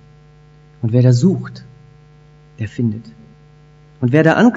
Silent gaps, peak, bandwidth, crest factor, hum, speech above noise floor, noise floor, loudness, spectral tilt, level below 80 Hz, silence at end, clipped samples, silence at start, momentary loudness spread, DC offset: none; 0 dBFS; 7.8 kHz; 18 dB; 60 Hz at -40 dBFS; 32 dB; -45 dBFS; -16 LUFS; -8 dB/octave; -54 dBFS; 0 s; under 0.1%; 0.85 s; 19 LU; under 0.1%